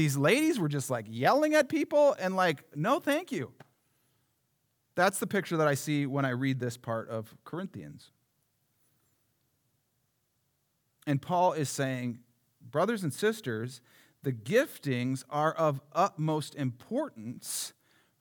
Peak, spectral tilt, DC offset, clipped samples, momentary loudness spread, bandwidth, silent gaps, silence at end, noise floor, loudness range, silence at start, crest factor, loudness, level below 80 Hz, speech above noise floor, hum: -12 dBFS; -5.5 dB/octave; under 0.1%; under 0.1%; 14 LU; over 20 kHz; none; 0.5 s; -77 dBFS; 11 LU; 0 s; 20 dB; -30 LUFS; -82 dBFS; 47 dB; none